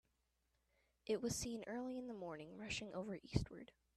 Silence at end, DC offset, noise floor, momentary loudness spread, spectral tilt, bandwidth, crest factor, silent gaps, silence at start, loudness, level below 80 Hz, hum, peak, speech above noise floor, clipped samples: 0.3 s; under 0.1%; -84 dBFS; 10 LU; -4.5 dB/octave; 13 kHz; 26 dB; none; 1.05 s; -46 LUFS; -62 dBFS; none; -22 dBFS; 38 dB; under 0.1%